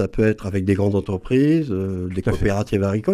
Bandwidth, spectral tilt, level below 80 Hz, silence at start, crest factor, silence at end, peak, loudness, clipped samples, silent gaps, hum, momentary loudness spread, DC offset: 13 kHz; -8 dB/octave; -36 dBFS; 0 s; 14 dB; 0 s; -6 dBFS; -21 LUFS; under 0.1%; none; none; 6 LU; under 0.1%